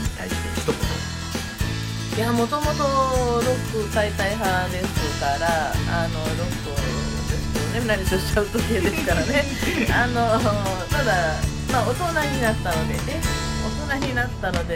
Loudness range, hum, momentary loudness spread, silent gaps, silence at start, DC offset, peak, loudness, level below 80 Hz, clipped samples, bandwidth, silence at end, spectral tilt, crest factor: 2 LU; none; 6 LU; none; 0 s; under 0.1%; -6 dBFS; -23 LUFS; -32 dBFS; under 0.1%; 16 kHz; 0 s; -5 dB/octave; 16 dB